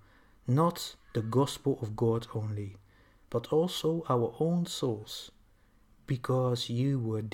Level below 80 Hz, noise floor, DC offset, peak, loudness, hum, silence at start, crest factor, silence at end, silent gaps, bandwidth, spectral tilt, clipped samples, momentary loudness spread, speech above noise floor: -62 dBFS; -63 dBFS; under 0.1%; -14 dBFS; -31 LUFS; none; 0.45 s; 18 dB; 0 s; none; 17 kHz; -6.5 dB/octave; under 0.1%; 11 LU; 33 dB